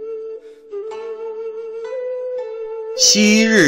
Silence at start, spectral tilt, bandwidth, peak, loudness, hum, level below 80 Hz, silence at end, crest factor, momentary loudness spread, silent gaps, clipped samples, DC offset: 0 s; -2.5 dB/octave; 16 kHz; -2 dBFS; -17 LUFS; none; -60 dBFS; 0 s; 16 dB; 19 LU; none; under 0.1%; under 0.1%